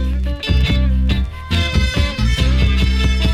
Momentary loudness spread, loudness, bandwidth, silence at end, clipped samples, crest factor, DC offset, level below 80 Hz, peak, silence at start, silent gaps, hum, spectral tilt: 5 LU; -17 LUFS; 10.5 kHz; 0 s; under 0.1%; 12 dB; under 0.1%; -16 dBFS; -4 dBFS; 0 s; none; none; -5.5 dB/octave